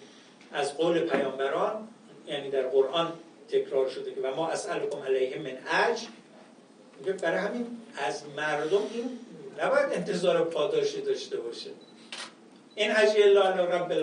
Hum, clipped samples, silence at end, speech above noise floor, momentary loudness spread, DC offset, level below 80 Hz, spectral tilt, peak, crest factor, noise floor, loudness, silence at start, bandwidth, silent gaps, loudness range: none; under 0.1%; 0 s; 26 dB; 16 LU; under 0.1%; -86 dBFS; -4 dB/octave; -8 dBFS; 20 dB; -54 dBFS; -28 LUFS; 0 s; 10.5 kHz; none; 5 LU